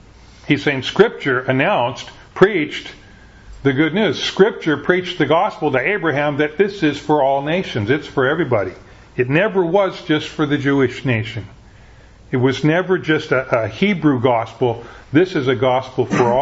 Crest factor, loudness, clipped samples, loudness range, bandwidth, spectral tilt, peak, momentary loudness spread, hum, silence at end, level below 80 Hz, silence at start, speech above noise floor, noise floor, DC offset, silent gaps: 18 dB; -17 LUFS; under 0.1%; 2 LU; 8 kHz; -6.5 dB/octave; 0 dBFS; 6 LU; none; 0 s; -48 dBFS; 0.45 s; 27 dB; -43 dBFS; under 0.1%; none